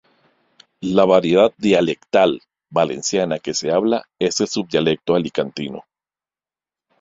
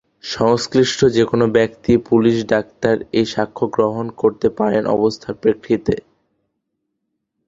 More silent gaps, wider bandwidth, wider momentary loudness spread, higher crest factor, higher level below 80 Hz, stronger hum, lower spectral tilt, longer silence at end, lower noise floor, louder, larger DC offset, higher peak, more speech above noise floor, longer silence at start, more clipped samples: neither; about the same, 8 kHz vs 7.8 kHz; first, 11 LU vs 5 LU; about the same, 18 dB vs 16 dB; second, -58 dBFS vs -48 dBFS; neither; second, -4.5 dB/octave vs -6 dB/octave; second, 1.2 s vs 1.45 s; first, under -90 dBFS vs -75 dBFS; about the same, -18 LUFS vs -17 LUFS; neither; about the same, -2 dBFS vs -2 dBFS; first, over 72 dB vs 58 dB; first, 0.8 s vs 0.25 s; neither